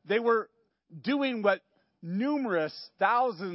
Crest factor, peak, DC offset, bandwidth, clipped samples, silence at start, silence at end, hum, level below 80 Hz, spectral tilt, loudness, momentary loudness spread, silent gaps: 20 dB; -10 dBFS; under 0.1%; 5.8 kHz; under 0.1%; 0.05 s; 0 s; none; -88 dBFS; -9.5 dB/octave; -29 LUFS; 11 LU; none